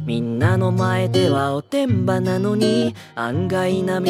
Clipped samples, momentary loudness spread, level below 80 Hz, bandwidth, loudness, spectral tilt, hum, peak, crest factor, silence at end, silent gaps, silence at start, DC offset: under 0.1%; 5 LU; -58 dBFS; 15 kHz; -20 LUFS; -7 dB/octave; none; -4 dBFS; 16 dB; 0 s; none; 0 s; under 0.1%